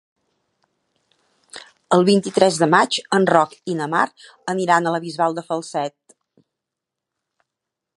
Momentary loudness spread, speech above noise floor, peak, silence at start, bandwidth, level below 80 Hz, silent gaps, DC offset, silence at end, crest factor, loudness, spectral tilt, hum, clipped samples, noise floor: 16 LU; 65 dB; 0 dBFS; 1.55 s; 11.5 kHz; -70 dBFS; none; under 0.1%; 2.1 s; 20 dB; -19 LUFS; -4.5 dB/octave; none; under 0.1%; -84 dBFS